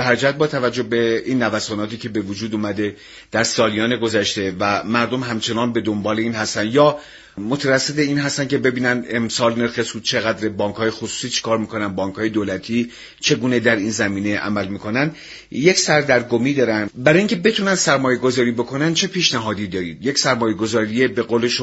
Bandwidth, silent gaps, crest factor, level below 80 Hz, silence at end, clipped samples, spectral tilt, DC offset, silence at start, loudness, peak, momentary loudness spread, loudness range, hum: 8.2 kHz; none; 18 dB; -54 dBFS; 0 s; under 0.1%; -4 dB/octave; under 0.1%; 0 s; -19 LUFS; 0 dBFS; 8 LU; 4 LU; none